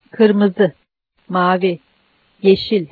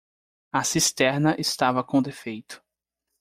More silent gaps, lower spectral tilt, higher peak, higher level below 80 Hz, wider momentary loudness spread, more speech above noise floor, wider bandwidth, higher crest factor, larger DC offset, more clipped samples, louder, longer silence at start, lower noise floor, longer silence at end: neither; first, -9 dB/octave vs -3.5 dB/octave; first, 0 dBFS vs -8 dBFS; first, -56 dBFS vs -62 dBFS; second, 8 LU vs 15 LU; second, 45 dB vs 60 dB; second, 4.8 kHz vs 16 kHz; about the same, 16 dB vs 18 dB; neither; neither; first, -16 LUFS vs -23 LUFS; second, 0.15 s vs 0.55 s; second, -59 dBFS vs -84 dBFS; second, 0.05 s vs 0.65 s